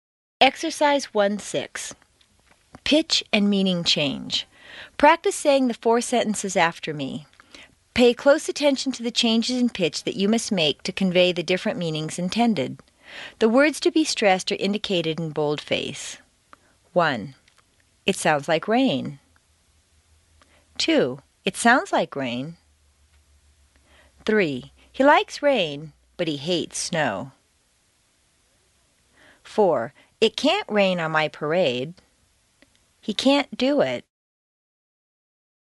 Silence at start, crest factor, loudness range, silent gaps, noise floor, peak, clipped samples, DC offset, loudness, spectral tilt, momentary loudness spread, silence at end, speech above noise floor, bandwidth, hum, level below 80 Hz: 0.4 s; 22 dB; 5 LU; none; -64 dBFS; -2 dBFS; under 0.1%; under 0.1%; -22 LUFS; -4 dB/octave; 14 LU; 1.8 s; 43 dB; 11.5 kHz; none; -60 dBFS